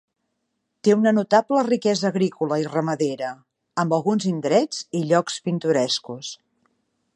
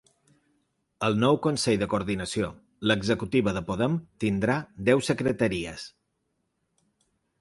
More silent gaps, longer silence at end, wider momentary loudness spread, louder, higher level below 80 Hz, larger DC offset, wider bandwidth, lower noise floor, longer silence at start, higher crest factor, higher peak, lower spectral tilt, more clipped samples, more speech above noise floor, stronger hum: neither; second, 0.8 s vs 1.5 s; first, 12 LU vs 8 LU; first, -22 LUFS vs -26 LUFS; second, -74 dBFS vs -54 dBFS; neither; about the same, 11.5 kHz vs 11.5 kHz; about the same, -76 dBFS vs -77 dBFS; second, 0.85 s vs 1 s; about the same, 18 dB vs 20 dB; first, -4 dBFS vs -8 dBFS; about the same, -5.5 dB/octave vs -5.5 dB/octave; neither; first, 55 dB vs 51 dB; neither